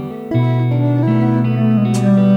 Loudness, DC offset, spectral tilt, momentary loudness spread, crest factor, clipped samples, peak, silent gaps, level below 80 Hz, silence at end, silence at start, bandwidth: -15 LUFS; under 0.1%; -8.5 dB/octave; 3 LU; 10 dB; under 0.1%; -4 dBFS; none; -52 dBFS; 0 s; 0 s; 10.5 kHz